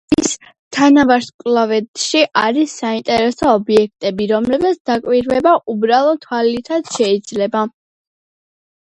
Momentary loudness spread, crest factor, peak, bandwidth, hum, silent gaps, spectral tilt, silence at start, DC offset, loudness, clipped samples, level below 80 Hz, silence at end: 8 LU; 16 dB; 0 dBFS; 11 kHz; none; 0.59-0.71 s, 1.34-1.39 s, 1.88-1.94 s, 4.80-4.85 s; -4 dB/octave; 0.1 s; under 0.1%; -15 LUFS; under 0.1%; -50 dBFS; 1.15 s